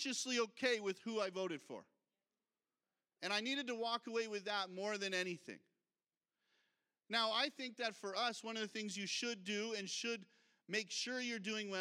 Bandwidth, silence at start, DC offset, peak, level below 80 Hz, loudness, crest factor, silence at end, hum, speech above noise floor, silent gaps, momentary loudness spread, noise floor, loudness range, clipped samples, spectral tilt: 16 kHz; 0 s; under 0.1%; -22 dBFS; under -90 dBFS; -41 LUFS; 22 dB; 0 s; none; over 48 dB; 6.17-6.21 s; 7 LU; under -90 dBFS; 3 LU; under 0.1%; -2 dB/octave